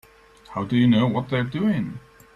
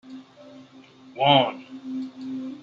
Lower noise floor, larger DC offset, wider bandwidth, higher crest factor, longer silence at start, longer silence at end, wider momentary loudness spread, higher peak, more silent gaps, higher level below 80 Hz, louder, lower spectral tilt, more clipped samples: about the same, -49 dBFS vs -49 dBFS; neither; about the same, 7.2 kHz vs 7.4 kHz; second, 14 dB vs 22 dB; first, 0.5 s vs 0.05 s; first, 0.35 s vs 0 s; second, 15 LU vs 25 LU; second, -8 dBFS vs -4 dBFS; neither; first, -56 dBFS vs -72 dBFS; about the same, -22 LUFS vs -24 LUFS; first, -8 dB/octave vs -6.5 dB/octave; neither